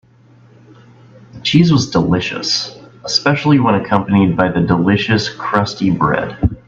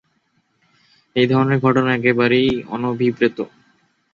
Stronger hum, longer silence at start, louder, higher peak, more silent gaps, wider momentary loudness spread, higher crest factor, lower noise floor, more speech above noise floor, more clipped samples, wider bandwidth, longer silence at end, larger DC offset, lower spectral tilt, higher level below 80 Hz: neither; first, 1.35 s vs 1.15 s; first, -14 LUFS vs -17 LUFS; about the same, 0 dBFS vs -2 dBFS; neither; second, 5 LU vs 9 LU; about the same, 16 dB vs 16 dB; second, -46 dBFS vs -65 dBFS; second, 32 dB vs 48 dB; neither; about the same, 7.6 kHz vs 7.2 kHz; second, 0.1 s vs 0.65 s; neither; second, -5.5 dB/octave vs -8 dB/octave; first, -38 dBFS vs -54 dBFS